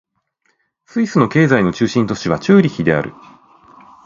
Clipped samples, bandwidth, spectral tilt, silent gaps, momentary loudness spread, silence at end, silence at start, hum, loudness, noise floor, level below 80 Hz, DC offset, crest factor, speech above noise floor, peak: under 0.1%; 7.6 kHz; -7 dB/octave; none; 8 LU; 0.95 s; 0.95 s; none; -15 LUFS; -65 dBFS; -48 dBFS; under 0.1%; 16 dB; 51 dB; 0 dBFS